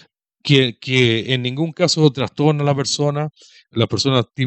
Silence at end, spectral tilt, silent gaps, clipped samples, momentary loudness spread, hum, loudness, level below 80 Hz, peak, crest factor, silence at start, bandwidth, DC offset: 0 s; -5 dB/octave; none; under 0.1%; 8 LU; none; -17 LUFS; -58 dBFS; 0 dBFS; 18 dB; 0.45 s; 8.6 kHz; under 0.1%